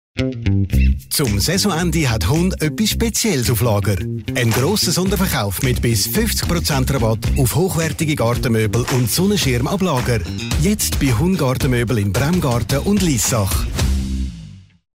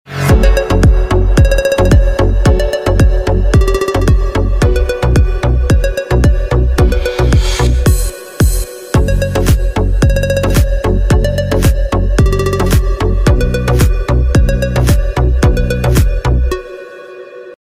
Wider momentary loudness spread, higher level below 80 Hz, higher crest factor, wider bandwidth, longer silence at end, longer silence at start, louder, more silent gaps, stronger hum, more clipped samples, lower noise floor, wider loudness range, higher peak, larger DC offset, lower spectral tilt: about the same, 4 LU vs 4 LU; second, -26 dBFS vs -12 dBFS; about the same, 12 dB vs 10 dB; about the same, 16.5 kHz vs 16 kHz; about the same, 0.3 s vs 0.25 s; about the same, 0.15 s vs 0.1 s; second, -17 LUFS vs -12 LUFS; neither; neither; neither; first, -37 dBFS vs -30 dBFS; about the same, 1 LU vs 2 LU; second, -6 dBFS vs 0 dBFS; neither; second, -4.5 dB/octave vs -6.5 dB/octave